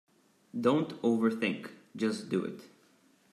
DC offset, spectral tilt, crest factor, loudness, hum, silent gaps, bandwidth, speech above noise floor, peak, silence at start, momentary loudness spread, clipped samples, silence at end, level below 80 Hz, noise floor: under 0.1%; -6.5 dB/octave; 20 dB; -32 LUFS; none; none; 13 kHz; 35 dB; -14 dBFS; 0.55 s; 14 LU; under 0.1%; 0.65 s; -82 dBFS; -65 dBFS